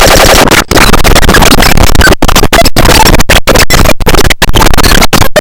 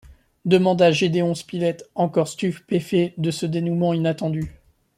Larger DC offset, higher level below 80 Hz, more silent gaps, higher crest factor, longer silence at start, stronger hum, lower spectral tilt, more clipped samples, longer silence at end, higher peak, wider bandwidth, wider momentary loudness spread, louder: first, 10% vs under 0.1%; first, -8 dBFS vs -54 dBFS; neither; second, 2 dB vs 18 dB; about the same, 0 s vs 0.1 s; neither; second, -3.5 dB/octave vs -6.5 dB/octave; first, 30% vs under 0.1%; second, 0 s vs 0.45 s; about the same, 0 dBFS vs -2 dBFS; first, over 20 kHz vs 13.5 kHz; second, 3 LU vs 9 LU; first, -4 LUFS vs -21 LUFS